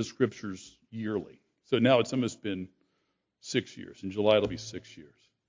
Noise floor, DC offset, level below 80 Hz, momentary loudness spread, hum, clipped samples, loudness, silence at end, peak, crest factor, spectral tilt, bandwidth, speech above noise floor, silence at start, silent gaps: -78 dBFS; under 0.1%; -62 dBFS; 20 LU; none; under 0.1%; -29 LUFS; 0.45 s; -8 dBFS; 22 dB; -5.5 dB/octave; 7.6 kHz; 48 dB; 0 s; none